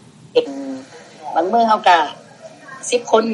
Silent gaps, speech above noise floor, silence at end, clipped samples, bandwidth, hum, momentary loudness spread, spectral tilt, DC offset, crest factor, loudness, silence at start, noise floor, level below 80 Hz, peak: none; 25 dB; 0 s; under 0.1%; 11 kHz; none; 20 LU; -3 dB/octave; under 0.1%; 18 dB; -17 LUFS; 0.35 s; -40 dBFS; -74 dBFS; 0 dBFS